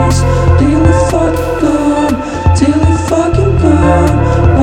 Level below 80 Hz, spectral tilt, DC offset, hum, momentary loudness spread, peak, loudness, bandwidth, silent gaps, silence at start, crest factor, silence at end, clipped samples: -18 dBFS; -7 dB/octave; under 0.1%; none; 4 LU; 0 dBFS; -10 LUFS; 12.5 kHz; none; 0 s; 8 dB; 0 s; under 0.1%